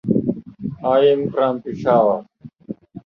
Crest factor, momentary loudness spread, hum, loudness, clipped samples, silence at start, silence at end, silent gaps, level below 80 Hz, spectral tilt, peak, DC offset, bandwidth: 16 dB; 18 LU; none; -19 LUFS; under 0.1%; 0.05 s; 0.05 s; none; -54 dBFS; -9 dB/octave; -4 dBFS; under 0.1%; 6.2 kHz